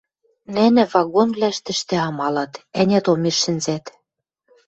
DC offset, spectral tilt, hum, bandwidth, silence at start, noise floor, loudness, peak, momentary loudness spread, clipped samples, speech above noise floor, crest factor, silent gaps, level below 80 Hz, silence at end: under 0.1%; -4.5 dB/octave; none; 8.2 kHz; 0.5 s; -75 dBFS; -19 LUFS; -2 dBFS; 10 LU; under 0.1%; 56 dB; 18 dB; none; -60 dBFS; 0.8 s